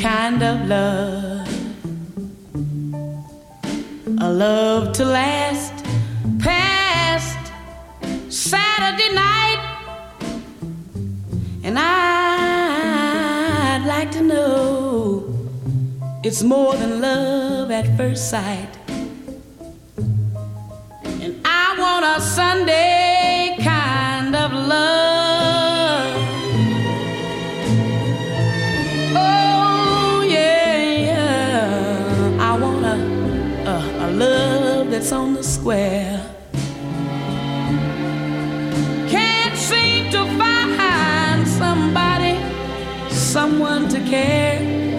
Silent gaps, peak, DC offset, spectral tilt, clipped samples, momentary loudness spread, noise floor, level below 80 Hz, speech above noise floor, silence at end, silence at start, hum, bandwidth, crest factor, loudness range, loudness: none; -2 dBFS; under 0.1%; -4.5 dB/octave; under 0.1%; 14 LU; -39 dBFS; -42 dBFS; 22 dB; 0 s; 0 s; none; 16 kHz; 16 dB; 6 LU; -18 LUFS